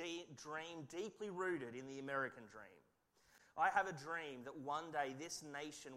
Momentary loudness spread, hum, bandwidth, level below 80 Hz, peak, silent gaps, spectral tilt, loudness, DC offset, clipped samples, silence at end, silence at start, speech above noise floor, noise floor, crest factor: 12 LU; none; 16 kHz; -84 dBFS; -24 dBFS; none; -3.5 dB/octave; -45 LUFS; under 0.1%; under 0.1%; 0 s; 0 s; 28 dB; -73 dBFS; 22 dB